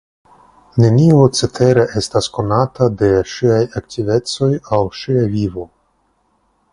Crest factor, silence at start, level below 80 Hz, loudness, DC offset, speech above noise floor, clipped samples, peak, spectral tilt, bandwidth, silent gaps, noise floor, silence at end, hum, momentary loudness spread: 16 dB; 0.75 s; -42 dBFS; -15 LUFS; under 0.1%; 47 dB; under 0.1%; 0 dBFS; -6.5 dB/octave; 11.5 kHz; none; -61 dBFS; 1.1 s; none; 10 LU